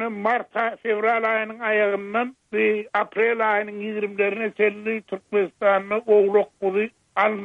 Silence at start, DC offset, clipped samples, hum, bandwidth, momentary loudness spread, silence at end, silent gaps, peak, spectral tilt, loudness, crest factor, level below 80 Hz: 0 s; under 0.1%; under 0.1%; none; 4.3 kHz; 8 LU; 0 s; none; -6 dBFS; -7 dB/octave; -22 LUFS; 16 dB; -74 dBFS